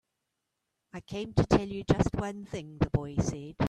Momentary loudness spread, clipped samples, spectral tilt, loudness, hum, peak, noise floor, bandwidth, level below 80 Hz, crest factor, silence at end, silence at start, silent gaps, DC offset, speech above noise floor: 14 LU; under 0.1%; -7 dB/octave; -30 LUFS; none; -10 dBFS; -84 dBFS; 11 kHz; -44 dBFS; 22 dB; 0 s; 0.95 s; none; under 0.1%; 54 dB